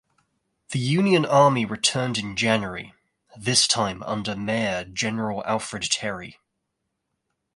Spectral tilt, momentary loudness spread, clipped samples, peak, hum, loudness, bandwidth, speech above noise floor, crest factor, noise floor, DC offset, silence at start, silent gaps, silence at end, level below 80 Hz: -3.5 dB/octave; 13 LU; under 0.1%; -4 dBFS; none; -23 LUFS; 11.5 kHz; 56 dB; 20 dB; -79 dBFS; under 0.1%; 0.7 s; none; 1.25 s; -58 dBFS